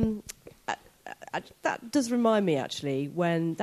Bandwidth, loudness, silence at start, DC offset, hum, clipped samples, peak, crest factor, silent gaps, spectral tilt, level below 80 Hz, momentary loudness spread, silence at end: 14 kHz; -29 LUFS; 0 s; under 0.1%; none; under 0.1%; -12 dBFS; 18 dB; none; -5.5 dB/octave; -54 dBFS; 15 LU; 0 s